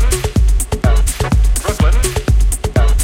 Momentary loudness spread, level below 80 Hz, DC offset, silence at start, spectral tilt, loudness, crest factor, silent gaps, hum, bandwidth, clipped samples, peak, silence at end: 2 LU; -14 dBFS; under 0.1%; 0 s; -5 dB/octave; -15 LUFS; 12 dB; none; none; 16.5 kHz; under 0.1%; 0 dBFS; 0 s